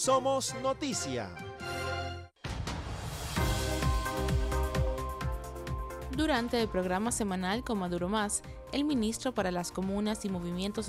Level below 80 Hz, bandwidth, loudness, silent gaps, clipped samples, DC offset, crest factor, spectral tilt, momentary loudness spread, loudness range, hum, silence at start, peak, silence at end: -40 dBFS; 16 kHz; -33 LUFS; none; under 0.1%; under 0.1%; 16 dB; -4.5 dB/octave; 9 LU; 3 LU; none; 0 s; -16 dBFS; 0 s